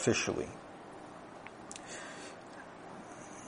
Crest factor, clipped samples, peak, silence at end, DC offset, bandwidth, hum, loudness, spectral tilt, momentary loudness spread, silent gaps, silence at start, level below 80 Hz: 24 dB; under 0.1%; -16 dBFS; 0 s; under 0.1%; 10.5 kHz; none; -42 LUFS; -3.5 dB/octave; 15 LU; none; 0 s; -66 dBFS